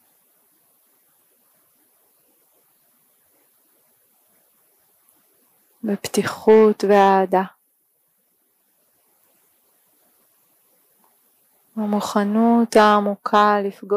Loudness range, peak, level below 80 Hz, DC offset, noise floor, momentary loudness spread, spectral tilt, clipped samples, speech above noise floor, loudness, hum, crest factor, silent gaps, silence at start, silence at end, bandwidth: 13 LU; -4 dBFS; -68 dBFS; under 0.1%; -66 dBFS; 13 LU; -5.5 dB/octave; under 0.1%; 49 dB; -17 LUFS; none; 18 dB; none; 5.85 s; 0 s; 15.5 kHz